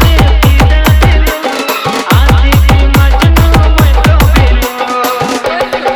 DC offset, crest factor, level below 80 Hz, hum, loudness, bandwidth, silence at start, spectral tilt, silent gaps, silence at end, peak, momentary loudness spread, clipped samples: under 0.1%; 6 dB; -10 dBFS; none; -8 LUFS; over 20 kHz; 0 s; -5.5 dB/octave; none; 0 s; 0 dBFS; 6 LU; 0.2%